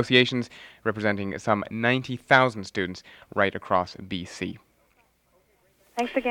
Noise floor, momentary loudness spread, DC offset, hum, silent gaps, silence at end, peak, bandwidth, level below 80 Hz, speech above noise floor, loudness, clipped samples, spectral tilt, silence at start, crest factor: -65 dBFS; 15 LU; under 0.1%; none; none; 0 s; -2 dBFS; 13 kHz; -62 dBFS; 40 dB; -26 LUFS; under 0.1%; -5 dB/octave; 0 s; 24 dB